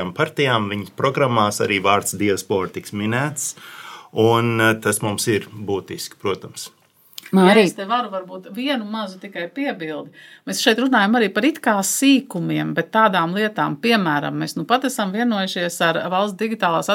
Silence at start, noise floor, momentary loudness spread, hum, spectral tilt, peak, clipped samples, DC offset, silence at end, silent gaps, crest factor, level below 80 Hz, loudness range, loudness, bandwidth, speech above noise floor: 0 s; -43 dBFS; 14 LU; none; -4 dB/octave; 0 dBFS; under 0.1%; under 0.1%; 0 s; none; 20 dB; -68 dBFS; 3 LU; -19 LUFS; 17 kHz; 23 dB